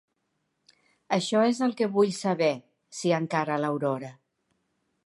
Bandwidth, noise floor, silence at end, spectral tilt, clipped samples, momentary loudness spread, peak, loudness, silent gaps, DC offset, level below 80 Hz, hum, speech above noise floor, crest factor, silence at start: 11.5 kHz; -77 dBFS; 0.95 s; -5.5 dB/octave; under 0.1%; 10 LU; -10 dBFS; -26 LUFS; none; under 0.1%; -78 dBFS; none; 51 dB; 18 dB; 1.1 s